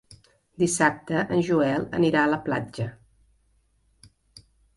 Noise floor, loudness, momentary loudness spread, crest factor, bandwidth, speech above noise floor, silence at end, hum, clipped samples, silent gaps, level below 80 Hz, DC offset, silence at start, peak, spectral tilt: -66 dBFS; -24 LUFS; 10 LU; 20 dB; 11.5 kHz; 42 dB; 1.85 s; none; under 0.1%; none; -58 dBFS; under 0.1%; 0.1 s; -6 dBFS; -5 dB/octave